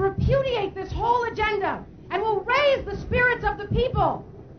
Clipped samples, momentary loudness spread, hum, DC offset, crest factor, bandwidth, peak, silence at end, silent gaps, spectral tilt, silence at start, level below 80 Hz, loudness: under 0.1%; 8 LU; none; 0.1%; 14 dB; 6.6 kHz; -10 dBFS; 0 s; none; -6.5 dB/octave; 0 s; -38 dBFS; -24 LUFS